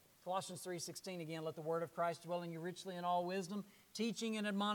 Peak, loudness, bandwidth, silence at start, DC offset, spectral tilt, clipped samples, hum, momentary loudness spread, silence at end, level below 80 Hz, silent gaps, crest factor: -26 dBFS; -43 LUFS; 19 kHz; 0.25 s; under 0.1%; -4.5 dB/octave; under 0.1%; none; 7 LU; 0 s; -88 dBFS; none; 16 dB